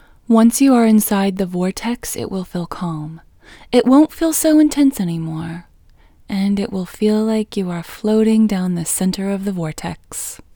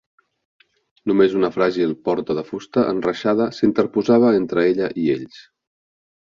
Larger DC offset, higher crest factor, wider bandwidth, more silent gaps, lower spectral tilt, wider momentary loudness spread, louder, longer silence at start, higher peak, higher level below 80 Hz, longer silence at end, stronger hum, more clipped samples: neither; about the same, 16 dB vs 18 dB; first, over 20 kHz vs 7.2 kHz; neither; second, -5.5 dB/octave vs -7 dB/octave; first, 14 LU vs 9 LU; about the same, -17 LUFS vs -19 LUFS; second, 0.3 s vs 1.05 s; about the same, 0 dBFS vs -2 dBFS; first, -46 dBFS vs -58 dBFS; second, 0.2 s vs 0.8 s; neither; neither